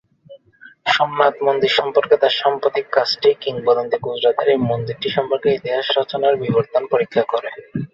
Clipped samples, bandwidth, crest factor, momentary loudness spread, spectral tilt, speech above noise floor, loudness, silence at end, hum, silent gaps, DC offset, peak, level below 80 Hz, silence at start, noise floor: under 0.1%; 7.6 kHz; 18 dB; 6 LU; -5.5 dB/octave; 29 dB; -18 LUFS; 0.05 s; none; none; under 0.1%; -2 dBFS; -60 dBFS; 0.3 s; -47 dBFS